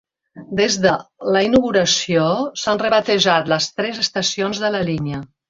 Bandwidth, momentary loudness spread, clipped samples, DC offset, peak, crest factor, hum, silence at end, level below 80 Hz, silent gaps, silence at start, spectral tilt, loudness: 7.8 kHz; 6 LU; under 0.1%; under 0.1%; -2 dBFS; 18 dB; none; 0.25 s; -50 dBFS; none; 0.35 s; -3.5 dB/octave; -18 LUFS